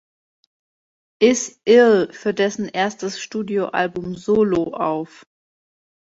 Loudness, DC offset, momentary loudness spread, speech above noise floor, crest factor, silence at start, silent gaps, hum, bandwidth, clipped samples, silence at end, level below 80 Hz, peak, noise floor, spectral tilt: -19 LUFS; under 0.1%; 13 LU; over 71 dB; 18 dB; 1.2 s; none; none; 8 kHz; under 0.1%; 1.05 s; -58 dBFS; -2 dBFS; under -90 dBFS; -4.5 dB/octave